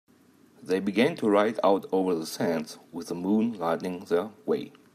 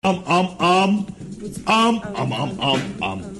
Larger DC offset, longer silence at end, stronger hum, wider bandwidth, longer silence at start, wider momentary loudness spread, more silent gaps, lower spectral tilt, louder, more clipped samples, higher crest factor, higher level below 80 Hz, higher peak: neither; first, 0.25 s vs 0 s; neither; first, 15 kHz vs 12 kHz; first, 0.6 s vs 0.05 s; second, 9 LU vs 12 LU; neither; about the same, -5.5 dB/octave vs -5 dB/octave; second, -27 LUFS vs -20 LUFS; neither; about the same, 18 dB vs 14 dB; second, -76 dBFS vs -50 dBFS; about the same, -8 dBFS vs -6 dBFS